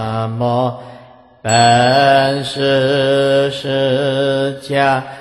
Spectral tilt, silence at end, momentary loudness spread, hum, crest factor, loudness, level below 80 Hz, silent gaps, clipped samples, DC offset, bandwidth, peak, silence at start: -4.5 dB/octave; 0 s; 8 LU; none; 14 dB; -14 LUFS; -52 dBFS; none; under 0.1%; under 0.1%; 12.5 kHz; 0 dBFS; 0 s